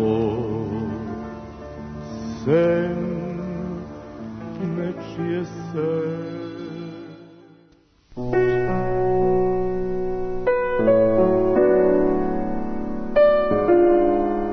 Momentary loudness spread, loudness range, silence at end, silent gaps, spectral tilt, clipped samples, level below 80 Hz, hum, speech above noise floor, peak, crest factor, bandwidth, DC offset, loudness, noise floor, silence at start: 18 LU; 9 LU; 0 s; none; -9 dB/octave; under 0.1%; -40 dBFS; none; 35 dB; -6 dBFS; 16 dB; 6.4 kHz; under 0.1%; -21 LUFS; -56 dBFS; 0 s